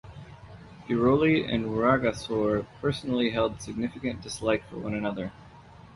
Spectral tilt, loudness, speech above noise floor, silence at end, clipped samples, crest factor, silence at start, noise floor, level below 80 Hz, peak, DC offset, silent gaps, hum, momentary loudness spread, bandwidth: -6 dB/octave; -27 LUFS; 23 dB; 0.1 s; under 0.1%; 18 dB; 0.05 s; -50 dBFS; -52 dBFS; -10 dBFS; under 0.1%; none; none; 21 LU; 11.5 kHz